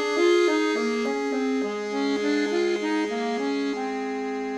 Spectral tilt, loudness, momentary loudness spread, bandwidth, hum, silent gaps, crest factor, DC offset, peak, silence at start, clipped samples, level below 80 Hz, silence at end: -4 dB/octave; -25 LUFS; 8 LU; 10.5 kHz; none; none; 14 dB; under 0.1%; -10 dBFS; 0 s; under 0.1%; -66 dBFS; 0 s